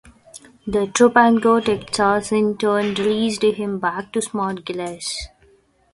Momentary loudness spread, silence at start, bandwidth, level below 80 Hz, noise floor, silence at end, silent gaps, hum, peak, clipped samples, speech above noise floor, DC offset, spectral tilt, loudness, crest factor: 13 LU; 0.35 s; 11.5 kHz; -50 dBFS; -56 dBFS; 0.65 s; none; none; 0 dBFS; under 0.1%; 37 dB; under 0.1%; -4 dB/octave; -19 LUFS; 20 dB